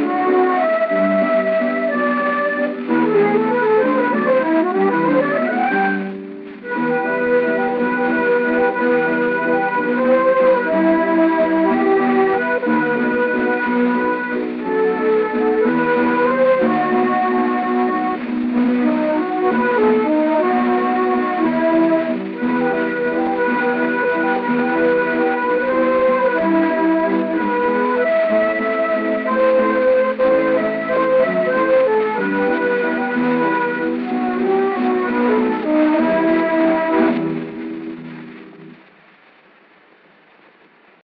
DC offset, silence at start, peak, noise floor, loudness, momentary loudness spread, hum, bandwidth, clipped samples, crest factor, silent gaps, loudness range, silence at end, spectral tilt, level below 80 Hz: under 0.1%; 0 s; -4 dBFS; -50 dBFS; -17 LUFS; 5 LU; none; 5 kHz; under 0.1%; 12 dB; none; 2 LU; 2.3 s; -9.5 dB/octave; -58 dBFS